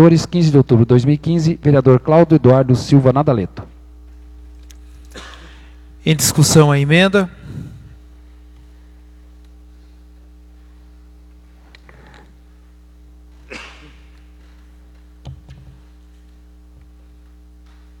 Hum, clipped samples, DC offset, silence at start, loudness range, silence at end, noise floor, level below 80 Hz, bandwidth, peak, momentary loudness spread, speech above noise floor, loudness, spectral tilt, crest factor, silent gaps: none; under 0.1%; under 0.1%; 0 s; 9 LU; 2.45 s; -44 dBFS; -42 dBFS; 16.5 kHz; 0 dBFS; 25 LU; 32 dB; -13 LUFS; -6 dB/octave; 18 dB; none